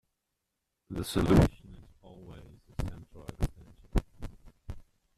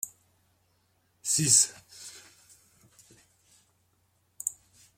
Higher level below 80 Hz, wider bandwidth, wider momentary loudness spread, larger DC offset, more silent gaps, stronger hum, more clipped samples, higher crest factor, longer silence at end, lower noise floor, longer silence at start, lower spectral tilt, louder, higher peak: first, -40 dBFS vs -74 dBFS; second, 14.5 kHz vs 16.5 kHz; about the same, 26 LU vs 25 LU; neither; neither; neither; neither; about the same, 24 dB vs 28 dB; about the same, 0.4 s vs 0.45 s; first, -84 dBFS vs -71 dBFS; first, 0.9 s vs 0.05 s; first, -7 dB/octave vs -1.5 dB/octave; second, -31 LUFS vs -25 LUFS; second, -10 dBFS vs -6 dBFS